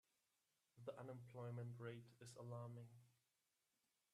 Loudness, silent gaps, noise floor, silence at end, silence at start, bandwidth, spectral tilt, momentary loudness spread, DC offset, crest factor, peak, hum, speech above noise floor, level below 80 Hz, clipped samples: -56 LUFS; none; -90 dBFS; 1 s; 0.75 s; 13 kHz; -7 dB/octave; 8 LU; under 0.1%; 20 dB; -38 dBFS; none; 35 dB; under -90 dBFS; under 0.1%